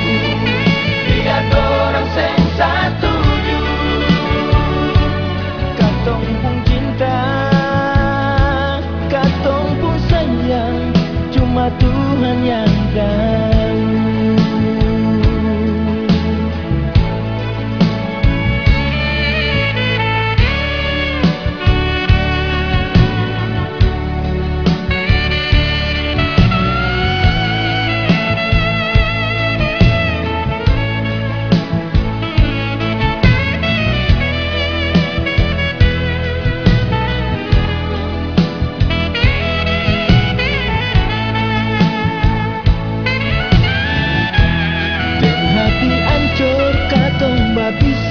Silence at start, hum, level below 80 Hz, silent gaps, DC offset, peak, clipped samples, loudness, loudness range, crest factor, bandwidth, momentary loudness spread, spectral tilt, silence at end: 0 s; none; -22 dBFS; none; 0.8%; 0 dBFS; under 0.1%; -15 LUFS; 2 LU; 14 dB; 5.4 kHz; 4 LU; -7.5 dB/octave; 0 s